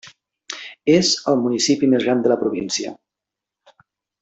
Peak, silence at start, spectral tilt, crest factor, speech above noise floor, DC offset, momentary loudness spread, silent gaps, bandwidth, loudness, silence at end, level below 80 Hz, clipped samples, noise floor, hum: -4 dBFS; 0.05 s; -4 dB/octave; 18 dB; 68 dB; under 0.1%; 16 LU; none; 8.2 kHz; -18 LUFS; 1.3 s; -60 dBFS; under 0.1%; -86 dBFS; none